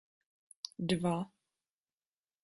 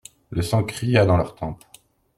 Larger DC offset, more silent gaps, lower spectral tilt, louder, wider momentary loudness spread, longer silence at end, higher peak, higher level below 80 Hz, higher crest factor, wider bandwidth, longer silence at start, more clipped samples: neither; neither; about the same, -6 dB/octave vs -6.5 dB/octave; second, -36 LUFS vs -21 LUFS; about the same, 14 LU vs 15 LU; first, 1.15 s vs 0.65 s; second, -20 dBFS vs -4 dBFS; second, -70 dBFS vs -46 dBFS; about the same, 20 dB vs 18 dB; second, 11.5 kHz vs 14.5 kHz; first, 0.8 s vs 0.3 s; neither